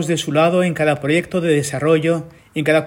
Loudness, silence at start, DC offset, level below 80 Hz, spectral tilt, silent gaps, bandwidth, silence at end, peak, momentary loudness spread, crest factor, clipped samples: -17 LUFS; 0 s; under 0.1%; -54 dBFS; -5.5 dB/octave; none; 16.5 kHz; 0 s; -2 dBFS; 6 LU; 14 dB; under 0.1%